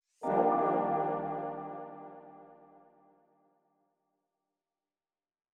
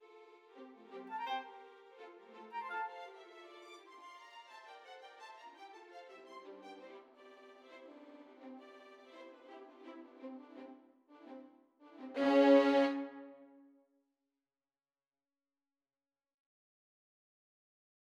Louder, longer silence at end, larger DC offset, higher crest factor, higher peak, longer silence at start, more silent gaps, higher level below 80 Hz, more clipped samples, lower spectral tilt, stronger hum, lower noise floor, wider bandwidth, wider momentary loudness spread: about the same, -32 LUFS vs -33 LUFS; second, 3 s vs 4.85 s; neither; about the same, 20 dB vs 24 dB; about the same, -16 dBFS vs -16 dBFS; second, 0.2 s vs 0.55 s; neither; about the same, under -90 dBFS vs under -90 dBFS; neither; first, -9 dB/octave vs -4.5 dB/octave; neither; about the same, under -90 dBFS vs under -90 dBFS; first, 9.4 kHz vs 7.8 kHz; second, 22 LU vs 25 LU